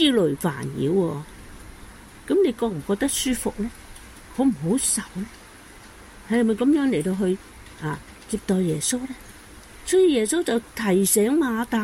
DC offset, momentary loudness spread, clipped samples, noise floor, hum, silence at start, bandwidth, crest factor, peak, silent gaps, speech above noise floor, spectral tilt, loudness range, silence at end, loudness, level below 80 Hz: under 0.1%; 22 LU; under 0.1%; -45 dBFS; none; 0 s; 16.5 kHz; 18 dB; -6 dBFS; none; 23 dB; -4.5 dB/octave; 4 LU; 0 s; -23 LUFS; -48 dBFS